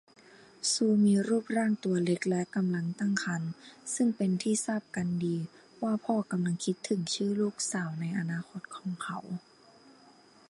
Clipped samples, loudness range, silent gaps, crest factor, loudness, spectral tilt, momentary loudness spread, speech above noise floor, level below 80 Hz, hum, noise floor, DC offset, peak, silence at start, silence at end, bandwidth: under 0.1%; 5 LU; none; 18 dB; -31 LUFS; -5 dB/octave; 11 LU; 28 dB; -74 dBFS; none; -59 dBFS; under 0.1%; -14 dBFS; 0.65 s; 1.1 s; 11.5 kHz